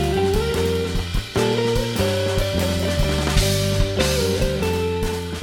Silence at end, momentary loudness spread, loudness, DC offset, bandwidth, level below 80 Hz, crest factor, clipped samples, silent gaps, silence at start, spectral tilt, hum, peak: 0 s; 4 LU; -21 LUFS; under 0.1%; 17.5 kHz; -28 dBFS; 16 dB; under 0.1%; none; 0 s; -5 dB/octave; none; -4 dBFS